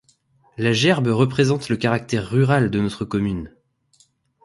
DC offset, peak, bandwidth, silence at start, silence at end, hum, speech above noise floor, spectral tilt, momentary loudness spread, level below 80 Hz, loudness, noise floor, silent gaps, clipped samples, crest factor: under 0.1%; -4 dBFS; 11.5 kHz; 0.6 s; 1 s; none; 41 dB; -6 dB/octave; 8 LU; -48 dBFS; -20 LUFS; -60 dBFS; none; under 0.1%; 18 dB